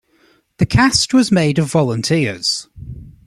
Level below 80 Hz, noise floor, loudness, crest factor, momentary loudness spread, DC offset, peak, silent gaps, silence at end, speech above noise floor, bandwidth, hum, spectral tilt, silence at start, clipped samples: -40 dBFS; -56 dBFS; -15 LUFS; 16 dB; 16 LU; under 0.1%; 0 dBFS; none; 0.15 s; 41 dB; 13 kHz; none; -4.5 dB/octave; 0.6 s; under 0.1%